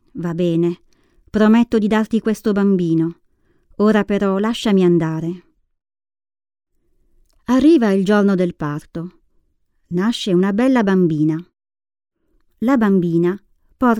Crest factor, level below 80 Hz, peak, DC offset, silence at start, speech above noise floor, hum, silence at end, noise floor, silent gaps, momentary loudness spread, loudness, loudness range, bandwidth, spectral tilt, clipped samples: 16 dB; -50 dBFS; -2 dBFS; under 0.1%; 0.15 s; 47 dB; none; 0 s; -63 dBFS; none; 12 LU; -17 LUFS; 3 LU; 12.5 kHz; -7.5 dB/octave; under 0.1%